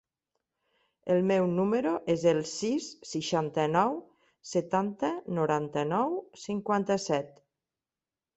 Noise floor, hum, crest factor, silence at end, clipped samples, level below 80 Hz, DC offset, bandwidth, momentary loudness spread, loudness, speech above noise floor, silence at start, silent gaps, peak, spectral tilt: under -90 dBFS; none; 20 dB; 1.1 s; under 0.1%; -70 dBFS; under 0.1%; 8.2 kHz; 10 LU; -29 LUFS; over 61 dB; 1.05 s; none; -10 dBFS; -5.5 dB/octave